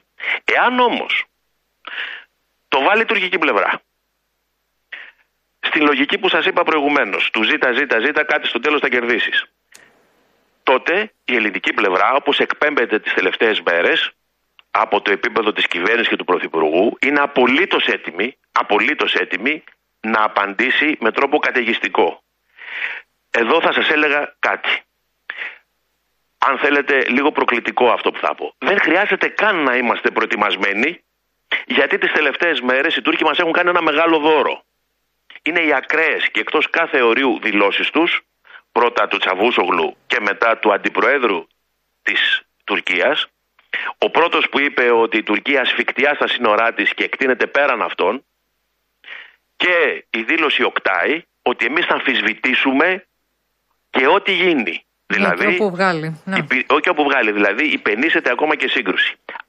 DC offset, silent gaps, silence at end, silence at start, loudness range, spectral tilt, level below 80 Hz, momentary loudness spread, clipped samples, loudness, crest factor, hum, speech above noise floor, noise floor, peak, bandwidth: under 0.1%; none; 0.1 s; 0.2 s; 3 LU; -4.5 dB/octave; -68 dBFS; 8 LU; under 0.1%; -16 LUFS; 16 dB; none; 53 dB; -70 dBFS; -2 dBFS; 8.8 kHz